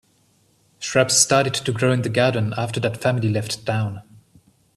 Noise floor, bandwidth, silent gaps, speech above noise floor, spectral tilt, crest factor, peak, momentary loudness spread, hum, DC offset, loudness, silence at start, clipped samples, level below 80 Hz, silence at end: -61 dBFS; 13.5 kHz; none; 41 dB; -4 dB/octave; 20 dB; -2 dBFS; 10 LU; none; under 0.1%; -20 LUFS; 0.8 s; under 0.1%; -58 dBFS; 0.75 s